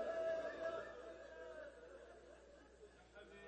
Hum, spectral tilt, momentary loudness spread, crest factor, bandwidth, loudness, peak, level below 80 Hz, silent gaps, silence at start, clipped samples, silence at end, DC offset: none; -4.5 dB/octave; 20 LU; 16 dB; 8.4 kHz; -49 LUFS; -34 dBFS; -72 dBFS; none; 0 s; under 0.1%; 0 s; under 0.1%